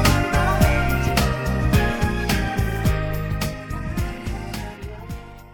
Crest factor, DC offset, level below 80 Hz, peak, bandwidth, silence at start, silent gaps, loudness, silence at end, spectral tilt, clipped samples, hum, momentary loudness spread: 18 dB; under 0.1%; -26 dBFS; -4 dBFS; 18 kHz; 0 s; none; -22 LUFS; 0 s; -5.5 dB/octave; under 0.1%; none; 15 LU